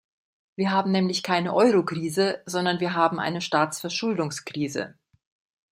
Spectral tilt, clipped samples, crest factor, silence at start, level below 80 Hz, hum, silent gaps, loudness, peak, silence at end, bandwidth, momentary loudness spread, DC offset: -5 dB/octave; under 0.1%; 20 dB; 0.6 s; -70 dBFS; none; none; -24 LUFS; -6 dBFS; 0.85 s; 15.5 kHz; 9 LU; under 0.1%